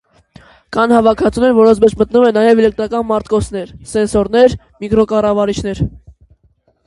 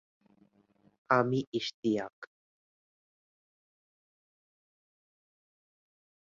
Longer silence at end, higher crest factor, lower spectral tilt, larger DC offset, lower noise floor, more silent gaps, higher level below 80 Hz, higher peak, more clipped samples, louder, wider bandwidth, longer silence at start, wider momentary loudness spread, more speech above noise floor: second, 0.95 s vs 4.05 s; second, 14 dB vs 28 dB; first, -6.5 dB/octave vs -4.5 dB/octave; neither; second, -56 dBFS vs -68 dBFS; second, none vs 1.47-1.52 s, 1.74-1.83 s, 2.13-2.22 s; first, -36 dBFS vs -78 dBFS; first, 0 dBFS vs -10 dBFS; neither; first, -13 LUFS vs -31 LUFS; first, 11.5 kHz vs 7.4 kHz; second, 0.7 s vs 1.1 s; second, 11 LU vs 22 LU; first, 44 dB vs 37 dB